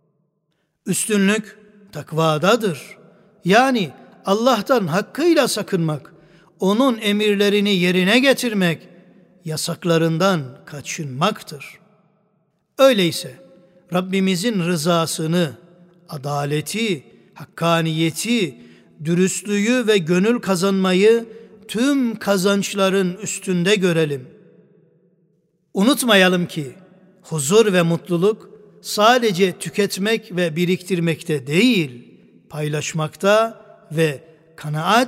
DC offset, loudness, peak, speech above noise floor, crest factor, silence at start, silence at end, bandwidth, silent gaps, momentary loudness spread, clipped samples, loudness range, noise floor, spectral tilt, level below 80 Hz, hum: under 0.1%; -19 LUFS; -2 dBFS; 52 dB; 18 dB; 0.85 s; 0 s; 16 kHz; none; 14 LU; under 0.1%; 4 LU; -70 dBFS; -4.5 dB/octave; -68 dBFS; none